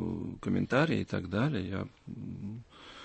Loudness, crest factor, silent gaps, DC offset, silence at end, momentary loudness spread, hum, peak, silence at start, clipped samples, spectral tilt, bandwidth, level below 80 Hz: -33 LUFS; 20 dB; none; under 0.1%; 0 s; 16 LU; none; -14 dBFS; 0 s; under 0.1%; -7.5 dB/octave; 8.6 kHz; -60 dBFS